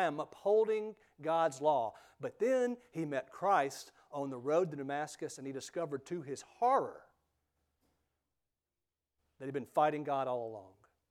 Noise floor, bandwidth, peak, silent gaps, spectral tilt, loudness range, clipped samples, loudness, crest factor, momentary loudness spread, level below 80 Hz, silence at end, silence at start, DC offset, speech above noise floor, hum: under -90 dBFS; 14.5 kHz; -18 dBFS; none; -5.5 dB/octave; 6 LU; under 0.1%; -35 LUFS; 20 dB; 14 LU; -84 dBFS; 0.4 s; 0 s; under 0.1%; over 55 dB; none